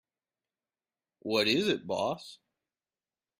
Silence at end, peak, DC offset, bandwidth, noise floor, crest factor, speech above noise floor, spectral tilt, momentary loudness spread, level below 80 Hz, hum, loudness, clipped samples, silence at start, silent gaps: 1.05 s; -14 dBFS; under 0.1%; 15.5 kHz; under -90 dBFS; 20 dB; over 60 dB; -4 dB/octave; 17 LU; -72 dBFS; none; -29 LUFS; under 0.1%; 1.25 s; none